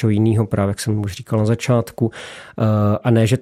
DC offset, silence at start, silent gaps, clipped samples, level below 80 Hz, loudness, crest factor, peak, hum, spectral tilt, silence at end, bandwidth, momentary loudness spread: under 0.1%; 0 s; none; under 0.1%; -50 dBFS; -19 LUFS; 16 dB; -2 dBFS; none; -7 dB/octave; 0 s; 14.5 kHz; 7 LU